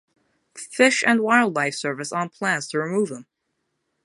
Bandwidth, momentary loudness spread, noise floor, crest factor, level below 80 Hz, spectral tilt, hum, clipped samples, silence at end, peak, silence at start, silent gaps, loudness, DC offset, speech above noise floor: 11.5 kHz; 12 LU; -76 dBFS; 22 dB; -76 dBFS; -3.5 dB/octave; none; under 0.1%; 0.8 s; -2 dBFS; 0.55 s; none; -21 LUFS; under 0.1%; 54 dB